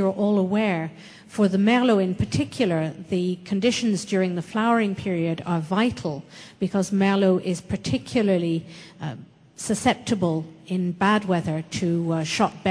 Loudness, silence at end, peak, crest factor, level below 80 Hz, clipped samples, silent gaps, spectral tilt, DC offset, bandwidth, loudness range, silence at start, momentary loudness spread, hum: -23 LUFS; 0 s; -6 dBFS; 18 dB; -56 dBFS; under 0.1%; none; -6 dB/octave; under 0.1%; 11 kHz; 3 LU; 0 s; 11 LU; none